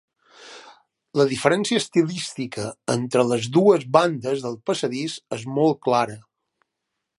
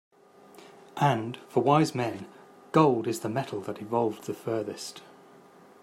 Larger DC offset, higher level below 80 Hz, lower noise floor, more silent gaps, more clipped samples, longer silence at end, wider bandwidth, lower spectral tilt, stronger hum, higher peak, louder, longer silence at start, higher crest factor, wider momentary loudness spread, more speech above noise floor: neither; first, -66 dBFS vs -74 dBFS; first, -81 dBFS vs -54 dBFS; neither; neither; first, 1 s vs 0.8 s; second, 11.5 kHz vs 16 kHz; second, -5 dB/octave vs -6.5 dB/octave; neither; first, 0 dBFS vs -8 dBFS; first, -22 LUFS vs -28 LUFS; second, 0.4 s vs 0.6 s; about the same, 22 dB vs 22 dB; second, 12 LU vs 17 LU; first, 59 dB vs 27 dB